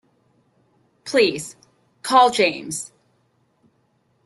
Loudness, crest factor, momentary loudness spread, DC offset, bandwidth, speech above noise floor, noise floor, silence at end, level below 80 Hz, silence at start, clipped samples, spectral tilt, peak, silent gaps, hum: -19 LUFS; 20 dB; 21 LU; under 0.1%; 12.5 kHz; 46 dB; -65 dBFS; 1.4 s; -66 dBFS; 1.05 s; under 0.1%; -2.5 dB/octave; -4 dBFS; none; none